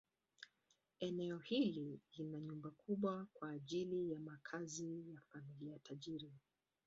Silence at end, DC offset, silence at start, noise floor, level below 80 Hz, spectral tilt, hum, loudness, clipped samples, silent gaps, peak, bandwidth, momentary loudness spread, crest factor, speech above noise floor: 0.5 s; under 0.1%; 0.4 s; -83 dBFS; -84 dBFS; -5.5 dB/octave; none; -46 LUFS; under 0.1%; none; -28 dBFS; 7.6 kHz; 15 LU; 18 dB; 37 dB